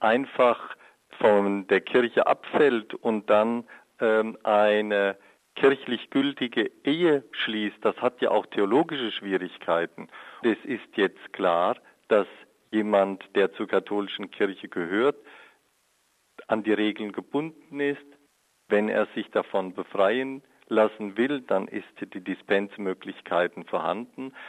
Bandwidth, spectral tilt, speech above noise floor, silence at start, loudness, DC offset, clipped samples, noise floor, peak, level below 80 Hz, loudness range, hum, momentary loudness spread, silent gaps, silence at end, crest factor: 10 kHz; -6.5 dB/octave; 43 dB; 0 s; -26 LUFS; under 0.1%; under 0.1%; -69 dBFS; -8 dBFS; -76 dBFS; 5 LU; none; 12 LU; none; 0 s; 18 dB